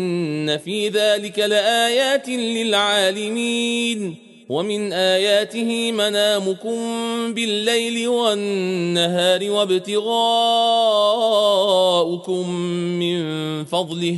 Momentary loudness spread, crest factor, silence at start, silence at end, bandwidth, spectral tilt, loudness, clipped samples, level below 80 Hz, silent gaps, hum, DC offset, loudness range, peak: 7 LU; 14 dB; 0 s; 0 s; 12 kHz; -3.5 dB/octave; -19 LUFS; under 0.1%; -70 dBFS; none; none; under 0.1%; 3 LU; -4 dBFS